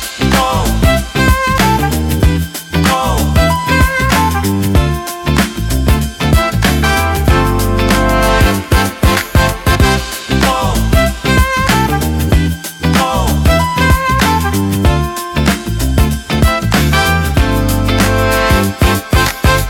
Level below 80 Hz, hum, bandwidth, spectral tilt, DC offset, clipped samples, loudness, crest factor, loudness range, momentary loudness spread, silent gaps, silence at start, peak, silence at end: -18 dBFS; none; 18 kHz; -5 dB/octave; under 0.1%; under 0.1%; -12 LUFS; 12 dB; 1 LU; 3 LU; none; 0 s; 0 dBFS; 0 s